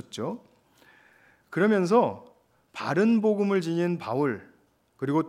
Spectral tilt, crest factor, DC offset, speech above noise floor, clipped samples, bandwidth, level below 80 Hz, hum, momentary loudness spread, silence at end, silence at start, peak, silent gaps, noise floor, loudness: -7 dB/octave; 18 dB; under 0.1%; 39 dB; under 0.1%; 12 kHz; -78 dBFS; none; 15 LU; 0 s; 0.15 s; -8 dBFS; none; -64 dBFS; -26 LUFS